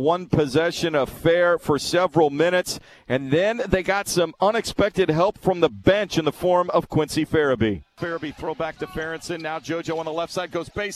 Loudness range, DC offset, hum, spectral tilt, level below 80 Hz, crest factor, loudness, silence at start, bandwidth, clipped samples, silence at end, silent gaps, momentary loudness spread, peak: 5 LU; under 0.1%; none; -5 dB/octave; -48 dBFS; 20 dB; -22 LUFS; 0 s; 14 kHz; under 0.1%; 0 s; none; 10 LU; -2 dBFS